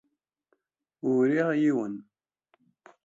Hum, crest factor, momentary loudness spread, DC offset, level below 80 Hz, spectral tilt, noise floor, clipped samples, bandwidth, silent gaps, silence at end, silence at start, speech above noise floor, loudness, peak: none; 16 dB; 12 LU; under 0.1%; -78 dBFS; -8 dB/octave; -75 dBFS; under 0.1%; 7.8 kHz; none; 1.05 s; 1.05 s; 50 dB; -26 LUFS; -12 dBFS